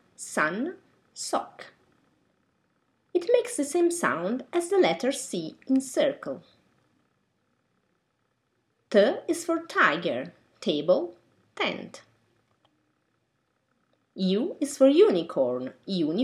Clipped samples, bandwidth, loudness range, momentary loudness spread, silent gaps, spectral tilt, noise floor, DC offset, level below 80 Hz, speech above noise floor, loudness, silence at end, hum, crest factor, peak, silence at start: under 0.1%; 15.5 kHz; 7 LU; 14 LU; none; -4.5 dB/octave; -74 dBFS; under 0.1%; -82 dBFS; 49 dB; -26 LUFS; 0 s; none; 20 dB; -8 dBFS; 0.2 s